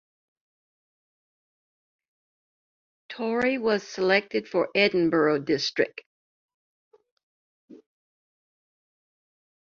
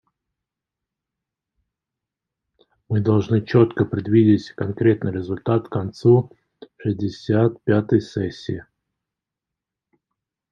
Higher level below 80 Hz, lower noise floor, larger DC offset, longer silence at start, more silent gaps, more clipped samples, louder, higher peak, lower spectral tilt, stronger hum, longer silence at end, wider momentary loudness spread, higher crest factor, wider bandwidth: second, -70 dBFS vs -60 dBFS; first, under -90 dBFS vs -86 dBFS; neither; first, 3.1 s vs 2.9 s; first, 6.06-6.48 s, 6.54-6.91 s, 7.12-7.17 s, 7.23-7.68 s vs none; neither; second, -25 LUFS vs -20 LUFS; second, -6 dBFS vs -2 dBFS; second, -5 dB/octave vs -9 dB/octave; neither; about the same, 1.9 s vs 1.9 s; second, 7 LU vs 11 LU; about the same, 24 dB vs 20 dB; about the same, 7.4 kHz vs 7.2 kHz